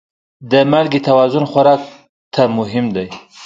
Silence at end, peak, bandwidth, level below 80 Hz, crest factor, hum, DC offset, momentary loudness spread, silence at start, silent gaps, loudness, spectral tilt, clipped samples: 0 s; 0 dBFS; 7.6 kHz; -54 dBFS; 14 dB; none; under 0.1%; 11 LU; 0.4 s; 2.09-2.31 s; -14 LUFS; -7 dB/octave; under 0.1%